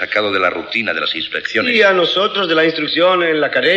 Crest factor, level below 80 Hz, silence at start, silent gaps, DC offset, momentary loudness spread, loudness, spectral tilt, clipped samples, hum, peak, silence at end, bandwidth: 14 dB; -60 dBFS; 0 s; none; under 0.1%; 7 LU; -14 LUFS; -4.5 dB/octave; under 0.1%; none; -2 dBFS; 0 s; 8.4 kHz